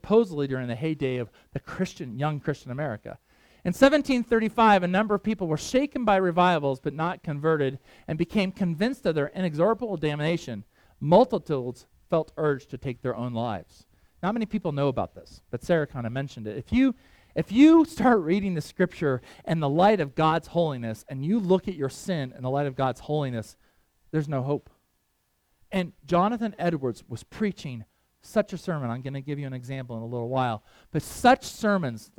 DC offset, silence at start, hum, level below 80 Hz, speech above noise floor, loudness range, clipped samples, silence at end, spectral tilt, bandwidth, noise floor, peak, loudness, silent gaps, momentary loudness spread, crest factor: under 0.1%; 0.05 s; none; -54 dBFS; 47 dB; 8 LU; under 0.1%; 0.15 s; -6.5 dB/octave; 17 kHz; -72 dBFS; -4 dBFS; -26 LUFS; none; 14 LU; 22 dB